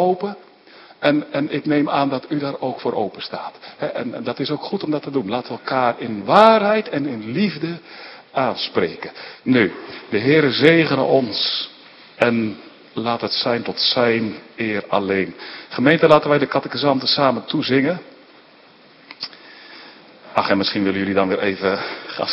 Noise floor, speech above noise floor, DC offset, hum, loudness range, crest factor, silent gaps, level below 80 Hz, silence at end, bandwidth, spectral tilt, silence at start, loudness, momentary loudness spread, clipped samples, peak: -48 dBFS; 29 dB; under 0.1%; none; 6 LU; 20 dB; none; -64 dBFS; 0 s; 8.2 kHz; -7 dB/octave; 0 s; -19 LUFS; 17 LU; under 0.1%; 0 dBFS